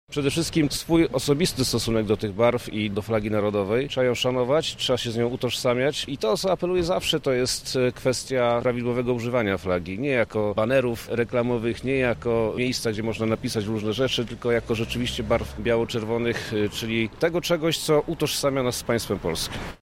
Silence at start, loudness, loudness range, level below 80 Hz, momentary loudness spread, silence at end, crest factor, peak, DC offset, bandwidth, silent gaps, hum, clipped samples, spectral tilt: 0.1 s; -24 LUFS; 2 LU; -46 dBFS; 4 LU; 0.05 s; 16 dB; -8 dBFS; under 0.1%; 16 kHz; none; none; under 0.1%; -4.5 dB/octave